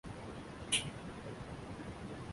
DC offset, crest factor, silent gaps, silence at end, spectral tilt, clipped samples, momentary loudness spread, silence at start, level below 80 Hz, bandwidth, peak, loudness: under 0.1%; 26 dB; none; 0 s; -3 dB/octave; under 0.1%; 12 LU; 0.05 s; -58 dBFS; 11.5 kHz; -18 dBFS; -41 LUFS